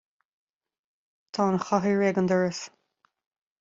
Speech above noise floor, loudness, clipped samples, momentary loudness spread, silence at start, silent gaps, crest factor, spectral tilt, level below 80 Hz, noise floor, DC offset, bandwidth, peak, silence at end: 47 dB; -25 LUFS; under 0.1%; 14 LU; 1.35 s; none; 18 dB; -6 dB/octave; -68 dBFS; -71 dBFS; under 0.1%; 7.8 kHz; -10 dBFS; 0.9 s